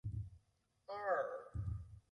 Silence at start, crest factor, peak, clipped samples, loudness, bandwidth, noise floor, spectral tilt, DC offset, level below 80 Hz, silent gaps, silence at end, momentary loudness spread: 0.05 s; 20 dB; -24 dBFS; under 0.1%; -44 LUFS; 10.5 kHz; -79 dBFS; -8 dB/octave; under 0.1%; -56 dBFS; none; 0.1 s; 14 LU